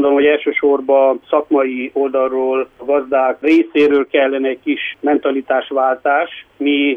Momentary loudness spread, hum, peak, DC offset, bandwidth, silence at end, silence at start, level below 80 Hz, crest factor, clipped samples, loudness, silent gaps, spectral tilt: 6 LU; none; -2 dBFS; under 0.1%; 6 kHz; 0 s; 0 s; -60 dBFS; 12 dB; under 0.1%; -15 LUFS; none; -5.5 dB/octave